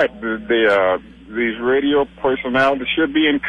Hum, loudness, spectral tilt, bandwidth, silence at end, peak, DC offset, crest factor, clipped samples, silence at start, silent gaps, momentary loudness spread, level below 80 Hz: none; -18 LUFS; -6 dB/octave; 10 kHz; 0 s; -4 dBFS; under 0.1%; 12 dB; under 0.1%; 0 s; none; 7 LU; -48 dBFS